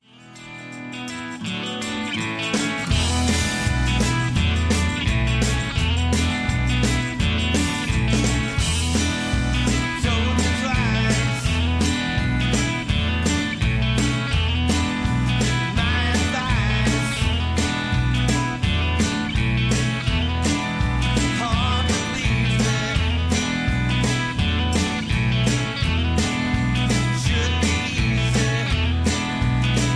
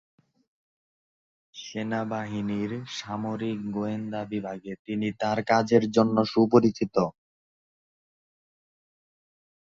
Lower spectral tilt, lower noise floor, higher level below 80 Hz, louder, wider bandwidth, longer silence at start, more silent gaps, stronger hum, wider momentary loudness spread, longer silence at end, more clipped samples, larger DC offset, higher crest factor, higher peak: second, -4.5 dB/octave vs -6.5 dB/octave; second, -43 dBFS vs under -90 dBFS; first, -28 dBFS vs -64 dBFS; first, -21 LUFS vs -27 LUFS; first, 11 kHz vs 7.6 kHz; second, 0.25 s vs 1.55 s; second, none vs 4.79-4.85 s; neither; second, 2 LU vs 13 LU; second, 0 s vs 2.5 s; neither; neither; second, 12 dB vs 24 dB; second, -8 dBFS vs -4 dBFS